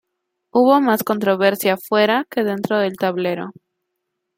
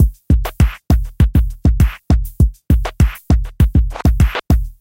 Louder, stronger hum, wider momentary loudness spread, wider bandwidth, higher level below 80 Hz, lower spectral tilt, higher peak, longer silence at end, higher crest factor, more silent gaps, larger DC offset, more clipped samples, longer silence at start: about the same, -18 LUFS vs -16 LUFS; neither; first, 8 LU vs 3 LU; about the same, 17 kHz vs 17 kHz; second, -68 dBFS vs -16 dBFS; second, -5 dB/octave vs -7.5 dB/octave; about the same, -2 dBFS vs 0 dBFS; first, 0.85 s vs 0.1 s; about the same, 16 dB vs 14 dB; neither; neither; neither; first, 0.55 s vs 0 s